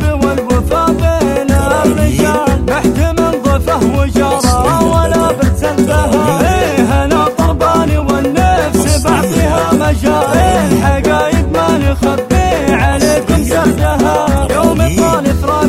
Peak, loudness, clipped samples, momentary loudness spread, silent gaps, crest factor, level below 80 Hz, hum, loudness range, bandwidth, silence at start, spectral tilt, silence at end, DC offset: 0 dBFS; -11 LUFS; under 0.1%; 2 LU; none; 10 dB; -18 dBFS; none; 1 LU; 16 kHz; 0 s; -6 dB/octave; 0 s; under 0.1%